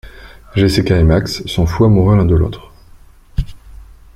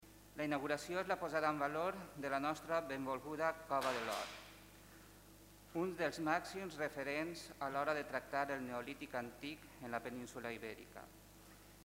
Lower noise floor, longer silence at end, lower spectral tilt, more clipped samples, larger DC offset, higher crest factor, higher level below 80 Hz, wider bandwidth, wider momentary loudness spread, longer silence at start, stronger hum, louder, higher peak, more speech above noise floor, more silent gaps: second, -41 dBFS vs -61 dBFS; first, 0.35 s vs 0 s; first, -7 dB/octave vs -4.5 dB/octave; neither; neither; second, 14 dB vs 22 dB; first, -28 dBFS vs -70 dBFS; second, 13.5 kHz vs 16 kHz; second, 14 LU vs 21 LU; about the same, 0.05 s vs 0 s; second, none vs 50 Hz at -65 dBFS; first, -14 LUFS vs -42 LUFS; first, -2 dBFS vs -22 dBFS; first, 30 dB vs 20 dB; neither